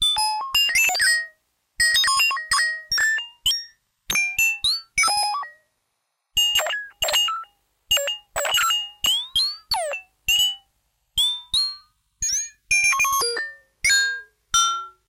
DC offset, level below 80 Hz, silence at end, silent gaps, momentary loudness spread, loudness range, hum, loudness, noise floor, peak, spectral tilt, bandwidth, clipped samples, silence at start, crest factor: under 0.1%; -52 dBFS; 0.2 s; none; 10 LU; 3 LU; none; -20 LUFS; -75 dBFS; -6 dBFS; 2.5 dB/octave; 16.5 kHz; under 0.1%; 0 s; 16 dB